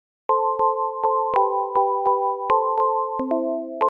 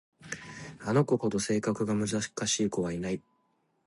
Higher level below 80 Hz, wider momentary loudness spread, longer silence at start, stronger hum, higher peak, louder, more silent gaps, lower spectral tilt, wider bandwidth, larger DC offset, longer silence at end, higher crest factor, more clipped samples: about the same, -64 dBFS vs -60 dBFS; second, 4 LU vs 13 LU; about the same, 0.3 s vs 0.2 s; neither; first, -6 dBFS vs -12 dBFS; first, -22 LUFS vs -30 LUFS; neither; first, -7.5 dB/octave vs -4.5 dB/octave; second, 4.8 kHz vs 11.5 kHz; neither; second, 0 s vs 0.65 s; about the same, 16 dB vs 20 dB; neither